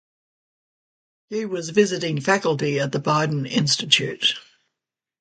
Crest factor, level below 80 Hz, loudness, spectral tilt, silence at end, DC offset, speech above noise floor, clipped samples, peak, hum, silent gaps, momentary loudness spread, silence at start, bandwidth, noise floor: 24 dB; -66 dBFS; -21 LUFS; -4 dB/octave; 0.8 s; under 0.1%; 64 dB; under 0.1%; 0 dBFS; none; none; 10 LU; 1.3 s; 9.4 kHz; -86 dBFS